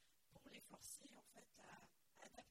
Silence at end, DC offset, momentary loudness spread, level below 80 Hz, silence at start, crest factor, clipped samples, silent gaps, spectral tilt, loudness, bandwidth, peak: 0 s; under 0.1%; 10 LU; -86 dBFS; 0 s; 22 dB; under 0.1%; none; -2 dB/octave; -62 LUFS; 16 kHz; -42 dBFS